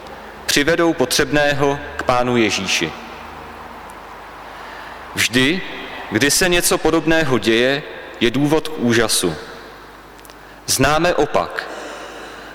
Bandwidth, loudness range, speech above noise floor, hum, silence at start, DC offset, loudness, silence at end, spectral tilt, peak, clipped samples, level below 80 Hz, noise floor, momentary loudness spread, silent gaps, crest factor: over 20 kHz; 5 LU; 23 dB; none; 0 s; under 0.1%; -17 LUFS; 0 s; -3.5 dB/octave; 0 dBFS; under 0.1%; -40 dBFS; -39 dBFS; 20 LU; none; 18 dB